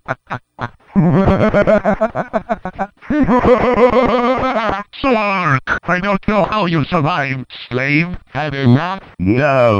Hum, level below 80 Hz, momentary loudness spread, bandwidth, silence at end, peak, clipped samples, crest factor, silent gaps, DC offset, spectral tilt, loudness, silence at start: none; -34 dBFS; 12 LU; 8.6 kHz; 0 s; -2 dBFS; under 0.1%; 14 dB; none; under 0.1%; -8 dB/octave; -15 LUFS; 0.1 s